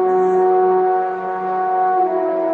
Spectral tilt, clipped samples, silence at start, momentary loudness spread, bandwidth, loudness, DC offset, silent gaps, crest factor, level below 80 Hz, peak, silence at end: -8.5 dB/octave; under 0.1%; 0 s; 7 LU; 4.1 kHz; -17 LUFS; under 0.1%; none; 10 dB; -66 dBFS; -6 dBFS; 0 s